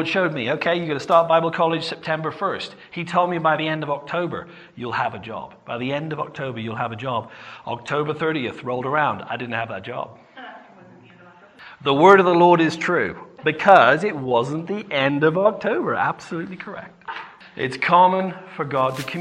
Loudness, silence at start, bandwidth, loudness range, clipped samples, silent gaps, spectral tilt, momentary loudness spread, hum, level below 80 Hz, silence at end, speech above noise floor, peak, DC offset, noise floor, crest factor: -20 LUFS; 0 s; 13 kHz; 11 LU; under 0.1%; none; -6 dB/octave; 19 LU; none; -64 dBFS; 0 s; 27 dB; 0 dBFS; under 0.1%; -48 dBFS; 22 dB